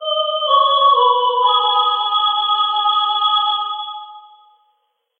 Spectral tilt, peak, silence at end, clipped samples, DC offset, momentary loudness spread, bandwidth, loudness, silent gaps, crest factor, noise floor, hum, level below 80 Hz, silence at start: 0 dB/octave; -4 dBFS; 1 s; under 0.1%; under 0.1%; 9 LU; 4.5 kHz; -15 LUFS; none; 14 dB; -67 dBFS; none; under -90 dBFS; 0 s